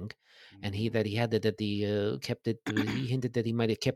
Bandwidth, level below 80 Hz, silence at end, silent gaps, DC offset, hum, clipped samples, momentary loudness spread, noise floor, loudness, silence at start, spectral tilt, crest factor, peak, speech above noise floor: 14 kHz; -66 dBFS; 0 s; none; under 0.1%; none; under 0.1%; 7 LU; -53 dBFS; -31 LUFS; 0 s; -6.5 dB/octave; 18 dB; -14 dBFS; 23 dB